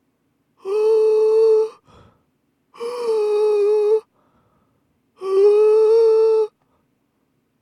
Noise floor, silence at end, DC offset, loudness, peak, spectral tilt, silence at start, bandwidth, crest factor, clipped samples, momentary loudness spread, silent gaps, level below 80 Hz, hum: -67 dBFS; 1.15 s; under 0.1%; -17 LUFS; -6 dBFS; -4 dB/octave; 0.65 s; 11 kHz; 12 dB; under 0.1%; 13 LU; none; -74 dBFS; none